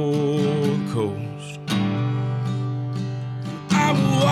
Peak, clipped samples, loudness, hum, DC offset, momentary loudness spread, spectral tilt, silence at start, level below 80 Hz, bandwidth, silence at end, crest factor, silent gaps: -6 dBFS; under 0.1%; -23 LUFS; none; under 0.1%; 11 LU; -6.5 dB/octave; 0 s; -56 dBFS; 14 kHz; 0 s; 16 dB; none